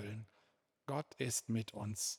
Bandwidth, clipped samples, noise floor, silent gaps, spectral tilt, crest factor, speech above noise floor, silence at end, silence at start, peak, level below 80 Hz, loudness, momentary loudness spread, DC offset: over 20 kHz; under 0.1%; -77 dBFS; none; -4 dB/octave; 18 dB; 36 dB; 0 s; 0 s; -26 dBFS; -78 dBFS; -41 LUFS; 15 LU; under 0.1%